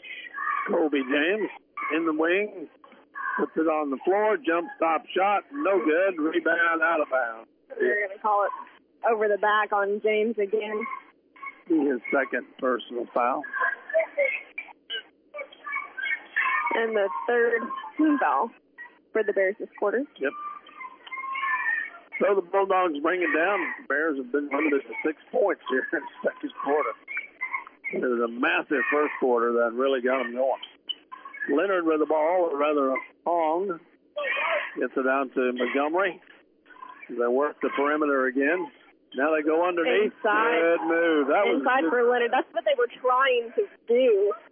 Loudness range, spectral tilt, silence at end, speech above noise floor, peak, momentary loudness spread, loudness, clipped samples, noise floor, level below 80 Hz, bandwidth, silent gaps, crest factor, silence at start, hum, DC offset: 5 LU; -8 dB/octave; 0.1 s; 29 dB; -12 dBFS; 12 LU; -25 LUFS; under 0.1%; -54 dBFS; -86 dBFS; 3.6 kHz; none; 14 dB; 0 s; none; under 0.1%